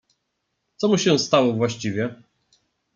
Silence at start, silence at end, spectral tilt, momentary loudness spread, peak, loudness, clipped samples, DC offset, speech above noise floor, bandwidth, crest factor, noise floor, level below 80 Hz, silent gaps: 0.8 s; 0.8 s; -5 dB/octave; 9 LU; -2 dBFS; -21 LUFS; under 0.1%; under 0.1%; 56 dB; 9.4 kHz; 22 dB; -76 dBFS; -66 dBFS; none